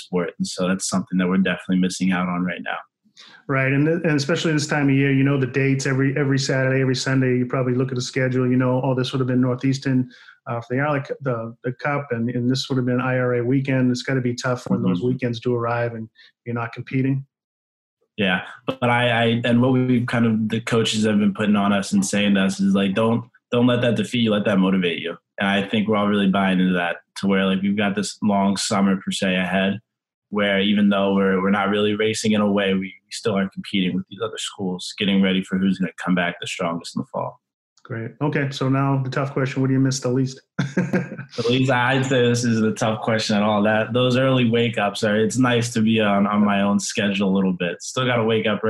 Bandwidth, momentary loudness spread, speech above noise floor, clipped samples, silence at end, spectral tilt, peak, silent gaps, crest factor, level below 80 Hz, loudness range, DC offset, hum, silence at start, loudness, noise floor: 12 kHz; 8 LU; over 70 dB; under 0.1%; 0 s; -5.5 dB/octave; -6 dBFS; 17.44-17.97 s, 30.14-30.22 s, 37.54-37.76 s; 14 dB; -62 dBFS; 5 LU; under 0.1%; none; 0 s; -21 LUFS; under -90 dBFS